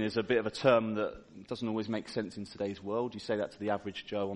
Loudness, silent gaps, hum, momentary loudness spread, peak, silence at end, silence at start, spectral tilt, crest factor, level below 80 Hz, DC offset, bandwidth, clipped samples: -33 LUFS; none; none; 11 LU; -10 dBFS; 0 s; 0 s; -6 dB/octave; 22 dB; -66 dBFS; under 0.1%; 11 kHz; under 0.1%